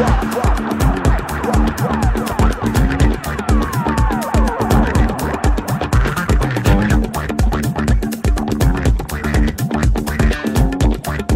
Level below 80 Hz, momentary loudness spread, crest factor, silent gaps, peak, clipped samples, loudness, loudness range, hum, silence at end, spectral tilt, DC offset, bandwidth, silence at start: -18 dBFS; 3 LU; 14 dB; none; 0 dBFS; under 0.1%; -17 LUFS; 1 LU; none; 0 s; -6.5 dB/octave; under 0.1%; 16.5 kHz; 0 s